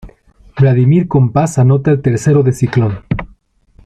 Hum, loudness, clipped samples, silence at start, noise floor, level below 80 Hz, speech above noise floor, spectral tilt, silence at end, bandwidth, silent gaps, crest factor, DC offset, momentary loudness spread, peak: none; -12 LUFS; under 0.1%; 0.05 s; -47 dBFS; -38 dBFS; 37 dB; -8 dB/octave; 0.6 s; 9.4 kHz; none; 12 dB; under 0.1%; 10 LU; 0 dBFS